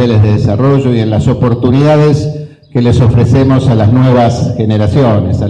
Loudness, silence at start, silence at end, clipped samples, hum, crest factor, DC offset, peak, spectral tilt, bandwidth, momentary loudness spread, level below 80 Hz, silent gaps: -9 LUFS; 0 s; 0 s; under 0.1%; none; 8 dB; 0.4%; 0 dBFS; -8.5 dB/octave; 9 kHz; 5 LU; -30 dBFS; none